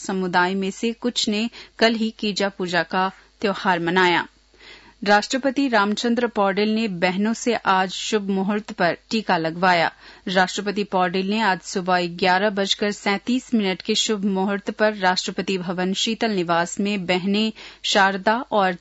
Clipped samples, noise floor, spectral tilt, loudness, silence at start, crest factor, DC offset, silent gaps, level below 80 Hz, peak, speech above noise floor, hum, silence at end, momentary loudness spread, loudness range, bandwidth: under 0.1%; -47 dBFS; -4 dB/octave; -21 LUFS; 0 s; 16 dB; under 0.1%; none; -60 dBFS; -4 dBFS; 26 dB; none; 0.05 s; 6 LU; 1 LU; 8 kHz